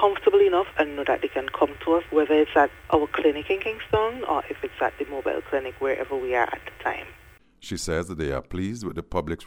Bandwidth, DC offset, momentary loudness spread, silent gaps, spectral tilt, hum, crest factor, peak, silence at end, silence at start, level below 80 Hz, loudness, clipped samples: 19.5 kHz; under 0.1%; 11 LU; none; -5.5 dB/octave; none; 18 dB; -6 dBFS; 0 s; 0 s; -48 dBFS; -25 LUFS; under 0.1%